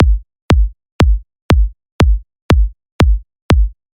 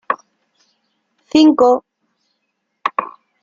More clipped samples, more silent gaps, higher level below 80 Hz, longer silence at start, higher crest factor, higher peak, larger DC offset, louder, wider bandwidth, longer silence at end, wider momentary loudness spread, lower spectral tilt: neither; first, 0.42-0.49 s, 0.92-0.99 s, 1.42-1.49 s, 1.92-1.99 s, 2.42-2.49 s, 2.92-2.99 s, 3.42-3.49 s vs none; first, -14 dBFS vs -60 dBFS; about the same, 0 s vs 0.1 s; about the same, 12 dB vs 16 dB; about the same, 0 dBFS vs -2 dBFS; neither; about the same, -16 LUFS vs -15 LUFS; first, 9 kHz vs 7.4 kHz; about the same, 0.25 s vs 0.35 s; second, 7 LU vs 14 LU; first, -7 dB/octave vs -4.5 dB/octave